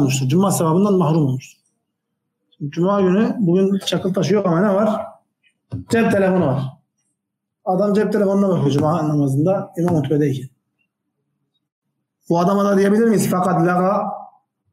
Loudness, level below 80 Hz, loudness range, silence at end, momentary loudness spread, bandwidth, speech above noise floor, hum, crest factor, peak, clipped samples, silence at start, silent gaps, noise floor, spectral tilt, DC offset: -17 LUFS; -60 dBFS; 3 LU; 0.45 s; 11 LU; 16 kHz; 62 dB; none; 12 dB; -6 dBFS; under 0.1%; 0 s; 11.72-11.82 s; -79 dBFS; -6.5 dB/octave; under 0.1%